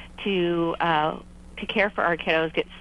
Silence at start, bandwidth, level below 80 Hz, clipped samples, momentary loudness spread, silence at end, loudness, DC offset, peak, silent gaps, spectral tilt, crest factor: 0 s; 11 kHz; -48 dBFS; under 0.1%; 10 LU; 0 s; -24 LUFS; under 0.1%; -8 dBFS; none; -6.5 dB/octave; 18 dB